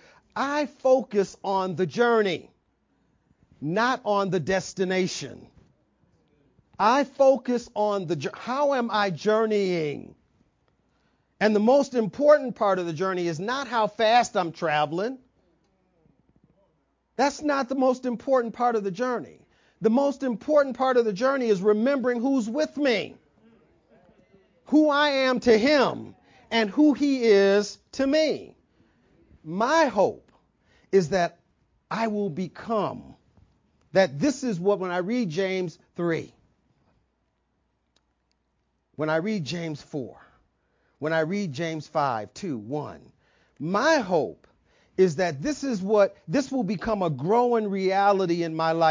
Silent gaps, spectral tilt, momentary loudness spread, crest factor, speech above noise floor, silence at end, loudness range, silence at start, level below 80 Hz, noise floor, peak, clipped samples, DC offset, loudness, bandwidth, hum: none; -5.5 dB/octave; 12 LU; 20 dB; 50 dB; 0 s; 7 LU; 0.35 s; -62 dBFS; -73 dBFS; -6 dBFS; under 0.1%; under 0.1%; -24 LUFS; 7.6 kHz; none